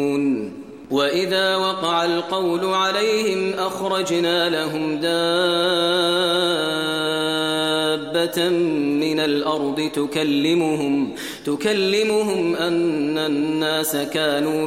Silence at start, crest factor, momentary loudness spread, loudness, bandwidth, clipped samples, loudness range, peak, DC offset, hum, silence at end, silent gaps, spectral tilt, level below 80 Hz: 0 s; 14 dB; 5 LU; -20 LUFS; 16 kHz; under 0.1%; 1 LU; -6 dBFS; 0.1%; none; 0 s; none; -4 dB/octave; -64 dBFS